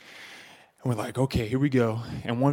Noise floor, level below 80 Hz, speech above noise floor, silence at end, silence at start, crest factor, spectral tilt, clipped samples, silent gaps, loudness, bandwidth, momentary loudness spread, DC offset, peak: -50 dBFS; -50 dBFS; 25 dB; 0 s; 0.05 s; 18 dB; -7.5 dB/octave; under 0.1%; none; -27 LUFS; 16.5 kHz; 20 LU; under 0.1%; -8 dBFS